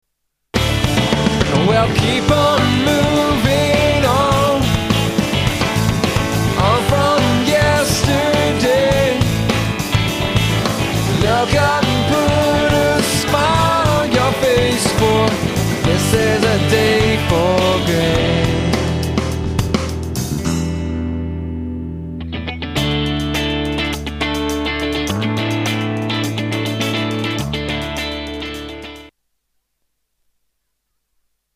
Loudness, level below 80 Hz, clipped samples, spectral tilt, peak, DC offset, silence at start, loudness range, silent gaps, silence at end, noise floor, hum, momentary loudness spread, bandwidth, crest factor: -16 LUFS; -30 dBFS; under 0.1%; -5 dB/octave; 0 dBFS; under 0.1%; 0.55 s; 7 LU; none; 2.5 s; -73 dBFS; none; 8 LU; 15.5 kHz; 16 dB